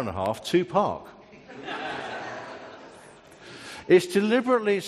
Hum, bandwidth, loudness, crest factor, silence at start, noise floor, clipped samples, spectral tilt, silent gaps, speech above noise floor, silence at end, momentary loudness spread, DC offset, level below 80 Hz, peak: none; 13.5 kHz; -25 LUFS; 20 dB; 0 s; -49 dBFS; under 0.1%; -5.5 dB/octave; none; 25 dB; 0 s; 23 LU; under 0.1%; -64 dBFS; -6 dBFS